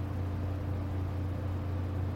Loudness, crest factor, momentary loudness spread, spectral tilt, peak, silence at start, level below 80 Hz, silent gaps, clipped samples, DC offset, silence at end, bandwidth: -35 LUFS; 10 dB; 1 LU; -9 dB/octave; -24 dBFS; 0 s; -48 dBFS; none; under 0.1%; under 0.1%; 0 s; 6.2 kHz